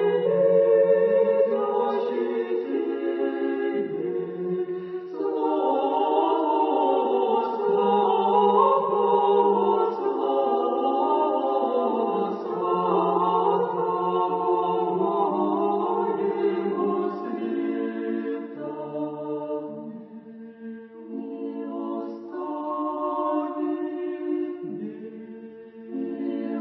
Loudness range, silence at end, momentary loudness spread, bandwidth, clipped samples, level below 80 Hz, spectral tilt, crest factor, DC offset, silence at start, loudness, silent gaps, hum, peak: 11 LU; 0 s; 14 LU; 5.6 kHz; under 0.1%; -78 dBFS; -9.5 dB/octave; 18 dB; under 0.1%; 0 s; -24 LUFS; none; none; -6 dBFS